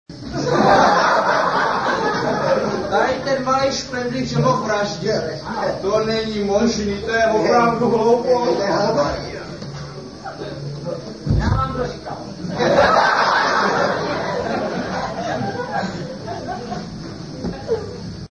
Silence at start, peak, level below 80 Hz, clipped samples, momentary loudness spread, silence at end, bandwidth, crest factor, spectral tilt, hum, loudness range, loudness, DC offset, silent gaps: 0.1 s; -2 dBFS; -38 dBFS; under 0.1%; 15 LU; 0.05 s; 10 kHz; 18 dB; -5 dB/octave; none; 8 LU; -19 LUFS; 0.2%; none